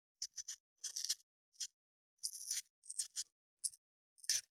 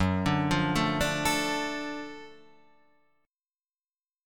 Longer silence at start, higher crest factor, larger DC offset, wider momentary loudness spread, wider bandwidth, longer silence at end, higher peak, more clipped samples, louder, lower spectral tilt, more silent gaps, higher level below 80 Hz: first, 0.2 s vs 0 s; first, 28 dB vs 20 dB; neither; second, 8 LU vs 13 LU; about the same, 19.5 kHz vs 19 kHz; second, 0.15 s vs 1.9 s; second, -20 dBFS vs -10 dBFS; neither; second, -44 LUFS vs -28 LUFS; second, 5.5 dB/octave vs -4.5 dB/octave; first, 0.60-0.76 s, 1.23-1.52 s, 1.73-2.17 s, 2.70-2.82 s, 3.32-3.57 s, 3.78-4.16 s vs none; second, under -90 dBFS vs -48 dBFS